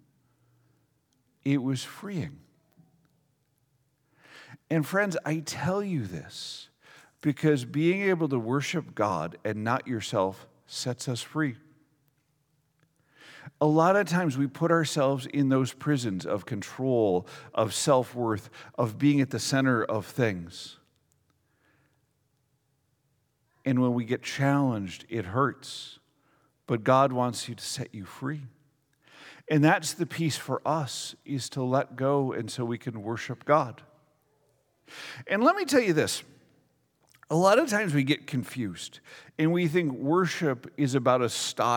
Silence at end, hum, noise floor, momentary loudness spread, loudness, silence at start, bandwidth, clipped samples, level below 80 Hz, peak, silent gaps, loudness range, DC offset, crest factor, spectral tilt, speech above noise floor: 0 s; none; -73 dBFS; 14 LU; -28 LUFS; 1.45 s; 19 kHz; under 0.1%; -72 dBFS; -8 dBFS; none; 8 LU; under 0.1%; 22 dB; -5.5 dB/octave; 46 dB